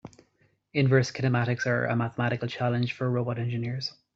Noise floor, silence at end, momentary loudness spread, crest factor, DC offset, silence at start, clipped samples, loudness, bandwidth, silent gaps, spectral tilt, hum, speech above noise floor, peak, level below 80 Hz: -68 dBFS; 0.25 s; 7 LU; 18 dB; under 0.1%; 0.05 s; under 0.1%; -27 LUFS; 7.6 kHz; none; -6.5 dB/octave; none; 41 dB; -8 dBFS; -64 dBFS